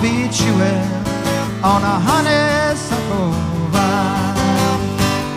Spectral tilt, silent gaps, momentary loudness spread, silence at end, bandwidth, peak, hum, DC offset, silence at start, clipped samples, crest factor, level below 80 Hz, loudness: -5 dB/octave; none; 5 LU; 0 s; 15.5 kHz; 0 dBFS; none; 0.2%; 0 s; under 0.1%; 16 dB; -36 dBFS; -16 LUFS